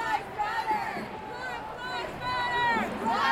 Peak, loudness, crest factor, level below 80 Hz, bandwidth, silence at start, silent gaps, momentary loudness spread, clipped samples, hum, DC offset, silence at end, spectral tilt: -12 dBFS; -30 LUFS; 18 dB; -56 dBFS; 16 kHz; 0 s; none; 10 LU; under 0.1%; none; under 0.1%; 0 s; -4 dB/octave